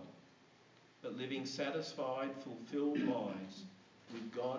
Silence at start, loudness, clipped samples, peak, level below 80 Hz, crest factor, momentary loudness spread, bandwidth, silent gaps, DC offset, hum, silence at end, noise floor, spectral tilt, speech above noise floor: 0 s; -41 LUFS; under 0.1%; -24 dBFS; -86 dBFS; 18 dB; 16 LU; 7.6 kHz; none; under 0.1%; none; 0 s; -66 dBFS; -5.5 dB/octave; 25 dB